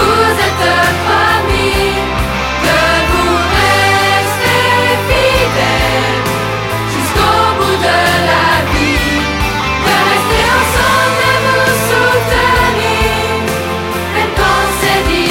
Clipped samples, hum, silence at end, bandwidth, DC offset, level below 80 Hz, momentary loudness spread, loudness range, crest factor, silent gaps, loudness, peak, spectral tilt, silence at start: under 0.1%; none; 0 s; 16.5 kHz; under 0.1%; -24 dBFS; 5 LU; 2 LU; 12 dB; none; -11 LUFS; 0 dBFS; -4 dB/octave; 0 s